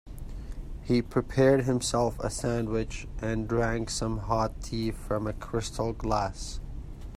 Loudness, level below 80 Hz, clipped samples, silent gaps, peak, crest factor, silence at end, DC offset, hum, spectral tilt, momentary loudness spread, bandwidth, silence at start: -29 LUFS; -40 dBFS; under 0.1%; none; -10 dBFS; 18 dB; 0 s; under 0.1%; none; -5.5 dB/octave; 17 LU; 15.5 kHz; 0.05 s